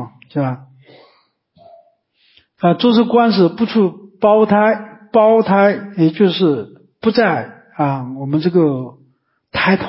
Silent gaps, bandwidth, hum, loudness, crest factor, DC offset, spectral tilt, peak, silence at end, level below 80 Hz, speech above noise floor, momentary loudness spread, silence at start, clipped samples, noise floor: none; 5.8 kHz; none; -15 LUFS; 14 dB; under 0.1%; -11.5 dB/octave; 0 dBFS; 0 s; -56 dBFS; 45 dB; 12 LU; 0 s; under 0.1%; -59 dBFS